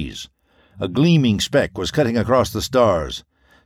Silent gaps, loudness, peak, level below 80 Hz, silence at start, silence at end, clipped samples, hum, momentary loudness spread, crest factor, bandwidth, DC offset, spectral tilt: none; -18 LUFS; -4 dBFS; -42 dBFS; 0 s; 0.45 s; under 0.1%; none; 15 LU; 16 dB; 15.5 kHz; under 0.1%; -5.5 dB/octave